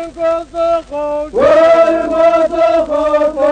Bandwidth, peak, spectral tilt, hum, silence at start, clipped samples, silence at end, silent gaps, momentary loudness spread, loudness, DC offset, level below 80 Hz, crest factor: 9.2 kHz; 0 dBFS; -5 dB/octave; none; 0 s; under 0.1%; 0 s; none; 9 LU; -12 LUFS; under 0.1%; -40 dBFS; 12 dB